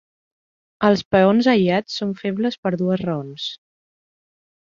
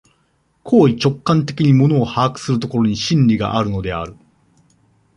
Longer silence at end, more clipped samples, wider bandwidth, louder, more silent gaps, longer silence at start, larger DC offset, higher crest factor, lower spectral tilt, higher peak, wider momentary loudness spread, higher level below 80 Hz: about the same, 1.1 s vs 1.05 s; neither; second, 7.4 kHz vs 10.5 kHz; second, -20 LUFS vs -16 LUFS; first, 1.05-1.11 s, 2.58-2.63 s vs none; first, 0.8 s vs 0.65 s; neither; about the same, 20 dB vs 16 dB; about the same, -6.5 dB/octave vs -7 dB/octave; about the same, -2 dBFS vs -2 dBFS; about the same, 11 LU vs 9 LU; second, -58 dBFS vs -44 dBFS